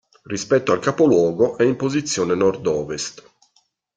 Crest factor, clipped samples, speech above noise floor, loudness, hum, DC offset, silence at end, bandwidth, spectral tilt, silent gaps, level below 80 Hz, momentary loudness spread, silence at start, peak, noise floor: 16 dB; under 0.1%; 45 dB; -19 LUFS; none; under 0.1%; 0.75 s; 9.4 kHz; -5 dB/octave; none; -58 dBFS; 12 LU; 0.3 s; -4 dBFS; -64 dBFS